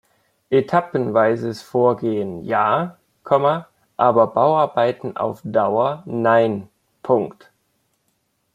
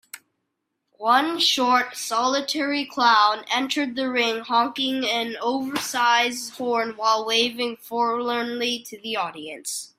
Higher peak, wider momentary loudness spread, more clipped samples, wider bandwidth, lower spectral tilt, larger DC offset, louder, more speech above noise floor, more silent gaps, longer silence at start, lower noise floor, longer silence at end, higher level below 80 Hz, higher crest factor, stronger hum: about the same, -2 dBFS vs -4 dBFS; about the same, 9 LU vs 10 LU; neither; second, 10.5 kHz vs 16 kHz; first, -7.5 dB/octave vs -1.5 dB/octave; neither; first, -19 LUFS vs -22 LUFS; second, 50 dB vs 55 dB; neither; first, 0.5 s vs 0.15 s; second, -69 dBFS vs -78 dBFS; first, 1.25 s vs 0.15 s; first, -64 dBFS vs -72 dBFS; about the same, 18 dB vs 18 dB; neither